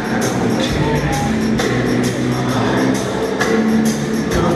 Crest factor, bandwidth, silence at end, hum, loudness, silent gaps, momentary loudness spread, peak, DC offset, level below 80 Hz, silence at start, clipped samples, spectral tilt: 14 dB; 14.5 kHz; 0 s; none; -17 LUFS; none; 3 LU; -2 dBFS; under 0.1%; -34 dBFS; 0 s; under 0.1%; -5.5 dB/octave